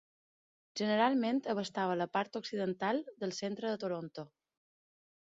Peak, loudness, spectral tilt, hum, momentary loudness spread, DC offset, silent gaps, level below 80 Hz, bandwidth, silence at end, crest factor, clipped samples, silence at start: -16 dBFS; -35 LUFS; -4 dB/octave; none; 12 LU; under 0.1%; none; -82 dBFS; 7.6 kHz; 1.05 s; 20 dB; under 0.1%; 0.75 s